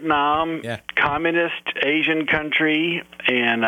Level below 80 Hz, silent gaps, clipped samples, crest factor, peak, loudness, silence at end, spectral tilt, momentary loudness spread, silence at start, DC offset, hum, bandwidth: -52 dBFS; none; under 0.1%; 14 dB; -6 dBFS; -20 LUFS; 0 s; -5.5 dB/octave; 5 LU; 0 s; under 0.1%; none; 11 kHz